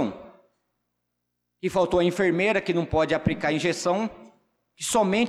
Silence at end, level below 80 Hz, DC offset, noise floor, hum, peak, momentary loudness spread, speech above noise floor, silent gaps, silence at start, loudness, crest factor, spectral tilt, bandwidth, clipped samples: 0 s; -50 dBFS; under 0.1%; -79 dBFS; 60 Hz at -50 dBFS; -12 dBFS; 10 LU; 56 dB; none; 0 s; -24 LUFS; 14 dB; -5 dB/octave; 14.5 kHz; under 0.1%